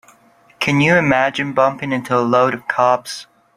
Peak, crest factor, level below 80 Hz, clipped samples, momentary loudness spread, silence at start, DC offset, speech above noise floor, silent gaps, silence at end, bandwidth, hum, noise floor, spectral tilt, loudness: -2 dBFS; 16 dB; -54 dBFS; under 0.1%; 9 LU; 0.6 s; under 0.1%; 35 dB; none; 0.35 s; 15.5 kHz; none; -51 dBFS; -5.5 dB/octave; -16 LUFS